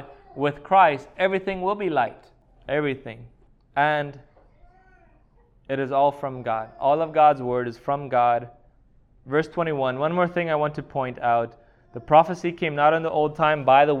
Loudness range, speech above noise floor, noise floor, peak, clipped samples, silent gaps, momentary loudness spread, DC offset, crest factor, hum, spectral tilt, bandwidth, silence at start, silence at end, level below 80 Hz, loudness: 5 LU; 35 dB; -57 dBFS; -4 dBFS; under 0.1%; none; 11 LU; under 0.1%; 20 dB; none; -7 dB/octave; 7.2 kHz; 0 s; 0 s; -56 dBFS; -23 LUFS